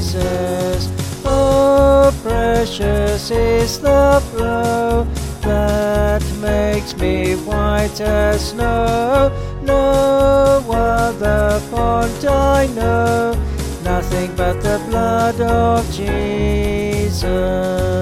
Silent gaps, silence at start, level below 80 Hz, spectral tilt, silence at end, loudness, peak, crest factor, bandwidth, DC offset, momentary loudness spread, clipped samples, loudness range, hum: none; 0 s; -24 dBFS; -6 dB/octave; 0 s; -16 LUFS; -2 dBFS; 14 dB; 16 kHz; 0.2%; 7 LU; under 0.1%; 3 LU; none